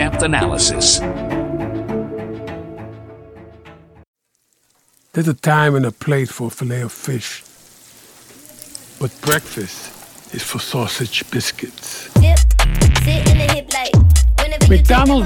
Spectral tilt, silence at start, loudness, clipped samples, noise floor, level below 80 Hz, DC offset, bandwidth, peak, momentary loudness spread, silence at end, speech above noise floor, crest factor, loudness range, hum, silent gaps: -4.5 dB/octave; 0 s; -16 LUFS; under 0.1%; -65 dBFS; -20 dBFS; under 0.1%; 18.5 kHz; 0 dBFS; 19 LU; 0 s; 50 dB; 16 dB; 13 LU; none; 4.07-4.14 s